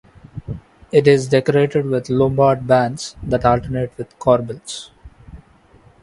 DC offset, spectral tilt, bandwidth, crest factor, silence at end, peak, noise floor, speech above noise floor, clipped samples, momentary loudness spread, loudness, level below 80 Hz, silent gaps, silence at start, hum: under 0.1%; -6.5 dB/octave; 11.5 kHz; 18 dB; 0.65 s; 0 dBFS; -50 dBFS; 33 dB; under 0.1%; 18 LU; -17 LUFS; -42 dBFS; none; 0.35 s; none